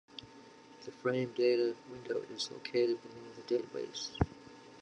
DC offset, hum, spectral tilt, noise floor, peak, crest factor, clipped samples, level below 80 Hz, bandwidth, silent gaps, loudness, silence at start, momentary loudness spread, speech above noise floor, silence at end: under 0.1%; none; -5.5 dB/octave; -56 dBFS; -14 dBFS; 22 dB; under 0.1%; -58 dBFS; 9.2 kHz; none; -35 LUFS; 0.15 s; 21 LU; 21 dB; 0 s